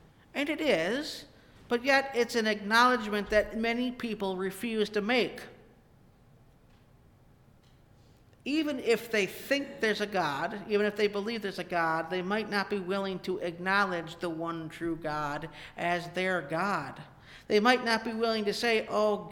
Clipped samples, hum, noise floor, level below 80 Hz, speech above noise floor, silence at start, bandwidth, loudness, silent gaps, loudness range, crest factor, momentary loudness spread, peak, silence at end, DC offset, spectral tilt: under 0.1%; none; -60 dBFS; -60 dBFS; 30 dB; 0.35 s; 19 kHz; -30 LUFS; none; 7 LU; 22 dB; 10 LU; -10 dBFS; 0 s; under 0.1%; -4.5 dB/octave